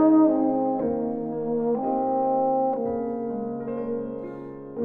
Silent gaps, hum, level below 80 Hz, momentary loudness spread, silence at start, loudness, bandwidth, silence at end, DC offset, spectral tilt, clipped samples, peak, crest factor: none; none; -60 dBFS; 11 LU; 0 s; -25 LUFS; 2.8 kHz; 0 s; under 0.1%; -12.5 dB/octave; under 0.1%; -8 dBFS; 16 dB